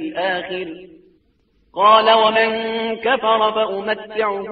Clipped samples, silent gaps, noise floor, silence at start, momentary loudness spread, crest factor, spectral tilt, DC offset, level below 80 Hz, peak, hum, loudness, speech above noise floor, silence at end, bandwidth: under 0.1%; none; -61 dBFS; 0 s; 14 LU; 18 dB; 0 dB/octave; under 0.1%; -60 dBFS; 0 dBFS; none; -17 LUFS; 43 dB; 0 s; 4.9 kHz